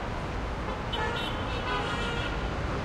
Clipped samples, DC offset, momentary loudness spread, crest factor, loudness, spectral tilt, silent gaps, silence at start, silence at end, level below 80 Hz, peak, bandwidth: under 0.1%; under 0.1%; 4 LU; 12 dB; -31 LUFS; -5.5 dB/octave; none; 0 s; 0 s; -38 dBFS; -18 dBFS; 13.5 kHz